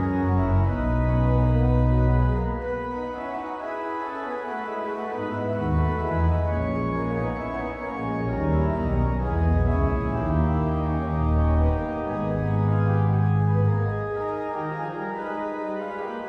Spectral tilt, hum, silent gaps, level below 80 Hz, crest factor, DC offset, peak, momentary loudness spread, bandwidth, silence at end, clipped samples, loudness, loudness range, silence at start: -10.5 dB/octave; none; none; -30 dBFS; 14 dB; under 0.1%; -10 dBFS; 9 LU; 5.8 kHz; 0 s; under 0.1%; -25 LUFS; 4 LU; 0 s